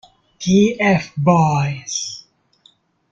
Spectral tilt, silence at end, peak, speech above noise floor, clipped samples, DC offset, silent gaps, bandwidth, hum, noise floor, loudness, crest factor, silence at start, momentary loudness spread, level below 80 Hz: -5.5 dB/octave; 0.95 s; -2 dBFS; 40 dB; under 0.1%; under 0.1%; none; 7.8 kHz; none; -56 dBFS; -17 LUFS; 16 dB; 0.4 s; 12 LU; -52 dBFS